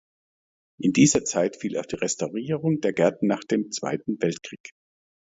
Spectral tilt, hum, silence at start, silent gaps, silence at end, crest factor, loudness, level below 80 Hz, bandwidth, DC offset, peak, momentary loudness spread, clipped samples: -4.5 dB/octave; none; 0.8 s; 4.60-4.64 s; 0.7 s; 20 dB; -24 LUFS; -60 dBFS; 8 kHz; under 0.1%; -6 dBFS; 11 LU; under 0.1%